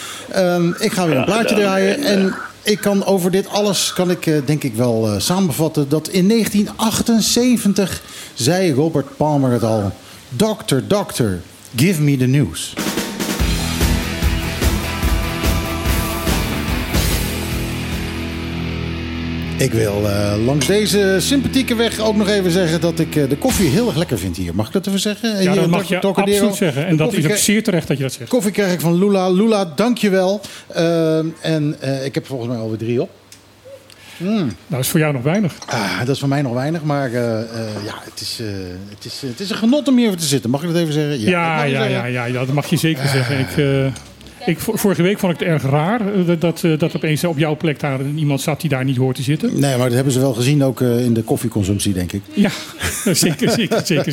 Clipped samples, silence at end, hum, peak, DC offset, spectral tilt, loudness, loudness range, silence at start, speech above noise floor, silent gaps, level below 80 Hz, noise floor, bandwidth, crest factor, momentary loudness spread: under 0.1%; 0 s; none; -2 dBFS; under 0.1%; -5 dB/octave; -17 LUFS; 5 LU; 0 s; 27 dB; none; -32 dBFS; -43 dBFS; 17 kHz; 14 dB; 8 LU